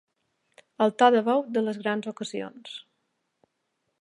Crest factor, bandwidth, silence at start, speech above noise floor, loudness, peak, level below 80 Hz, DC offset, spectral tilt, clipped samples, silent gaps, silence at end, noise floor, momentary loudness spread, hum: 22 dB; 11 kHz; 0.8 s; 53 dB; -25 LUFS; -6 dBFS; -84 dBFS; under 0.1%; -5 dB/octave; under 0.1%; none; 1.2 s; -78 dBFS; 21 LU; none